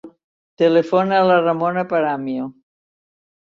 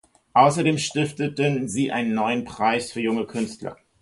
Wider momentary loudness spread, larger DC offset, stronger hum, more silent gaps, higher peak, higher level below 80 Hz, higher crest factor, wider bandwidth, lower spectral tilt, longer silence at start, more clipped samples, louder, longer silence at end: about the same, 11 LU vs 11 LU; neither; neither; first, 0.24-0.57 s vs none; about the same, -4 dBFS vs -4 dBFS; second, -66 dBFS vs -60 dBFS; about the same, 16 dB vs 20 dB; second, 7 kHz vs 11.5 kHz; first, -7.5 dB/octave vs -5 dB/octave; second, 0.05 s vs 0.35 s; neither; first, -18 LUFS vs -23 LUFS; first, 0.95 s vs 0.3 s